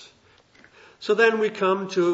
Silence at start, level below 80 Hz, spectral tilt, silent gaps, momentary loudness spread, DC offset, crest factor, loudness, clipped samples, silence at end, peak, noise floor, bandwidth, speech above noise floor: 0 s; -72 dBFS; -5 dB/octave; none; 6 LU; under 0.1%; 16 dB; -22 LUFS; under 0.1%; 0 s; -8 dBFS; -57 dBFS; 8 kHz; 36 dB